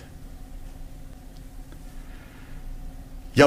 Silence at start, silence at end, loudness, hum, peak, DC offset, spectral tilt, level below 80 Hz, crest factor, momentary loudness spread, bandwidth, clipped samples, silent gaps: 0 s; 0 s; -41 LUFS; none; -2 dBFS; under 0.1%; -5.5 dB/octave; -40 dBFS; 26 dB; 3 LU; 16 kHz; under 0.1%; none